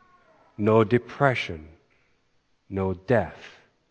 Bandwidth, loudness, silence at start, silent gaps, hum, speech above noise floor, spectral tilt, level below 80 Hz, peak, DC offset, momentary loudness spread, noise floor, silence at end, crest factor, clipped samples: 8.8 kHz; -25 LUFS; 0.6 s; none; none; 44 dB; -7.5 dB/octave; -56 dBFS; -4 dBFS; under 0.1%; 15 LU; -68 dBFS; 0.45 s; 22 dB; under 0.1%